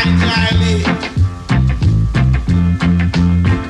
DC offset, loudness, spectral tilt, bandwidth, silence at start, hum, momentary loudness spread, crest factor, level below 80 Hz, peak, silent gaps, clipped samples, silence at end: under 0.1%; -14 LUFS; -6.5 dB/octave; 10 kHz; 0 s; none; 4 LU; 10 dB; -22 dBFS; -2 dBFS; none; under 0.1%; 0 s